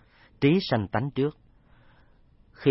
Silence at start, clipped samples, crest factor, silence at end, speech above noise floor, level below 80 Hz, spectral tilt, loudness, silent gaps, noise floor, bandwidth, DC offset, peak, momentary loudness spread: 0.4 s; under 0.1%; 20 dB; 0 s; 33 dB; -58 dBFS; -10.5 dB/octave; -26 LUFS; none; -58 dBFS; 5.8 kHz; under 0.1%; -10 dBFS; 6 LU